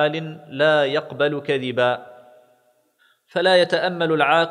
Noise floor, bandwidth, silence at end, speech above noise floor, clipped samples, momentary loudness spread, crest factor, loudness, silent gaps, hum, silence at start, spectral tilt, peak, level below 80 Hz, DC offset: -62 dBFS; 11 kHz; 0 s; 42 dB; under 0.1%; 11 LU; 18 dB; -20 LUFS; none; none; 0 s; -5.5 dB/octave; -2 dBFS; -74 dBFS; under 0.1%